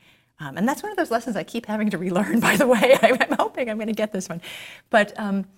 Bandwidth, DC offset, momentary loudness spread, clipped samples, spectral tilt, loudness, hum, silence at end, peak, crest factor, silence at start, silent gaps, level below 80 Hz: 16.5 kHz; under 0.1%; 17 LU; under 0.1%; -5 dB/octave; -21 LUFS; none; 0.1 s; -2 dBFS; 20 dB; 0.4 s; none; -64 dBFS